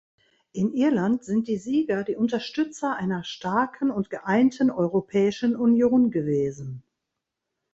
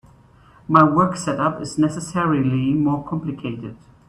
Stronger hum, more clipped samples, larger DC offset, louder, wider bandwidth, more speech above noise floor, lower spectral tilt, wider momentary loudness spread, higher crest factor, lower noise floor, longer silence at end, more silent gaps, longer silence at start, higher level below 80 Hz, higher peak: neither; neither; neither; second, -24 LUFS vs -20 LUFS; second, 8 kHz vs 11 kHz; first, 60 dB vs 31 dB; about the same, -7 dB/octave vs -7 dB/octave; second, 9 LU vs 14 LU; about the same, 16 dB vs 20 dB; first, -83 dBFS vs -50 dBFS; first, 0.95 s vs 0.35 s; neither; second, 0.55 s vs 0.7 s; second, -62 dBFS vs -52 dBFS; second, -10 dBFS vs 0 dBFS